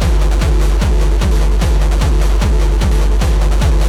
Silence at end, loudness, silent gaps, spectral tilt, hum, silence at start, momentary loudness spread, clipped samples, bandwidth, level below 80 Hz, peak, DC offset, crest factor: 0 s; -15 LUFS; none; -6 dB/octave; none; 0 s; 0 LU; under 0.1%; 13 kHz; -12 dBFS; -2 dBFS; under 0.1%; 8 dB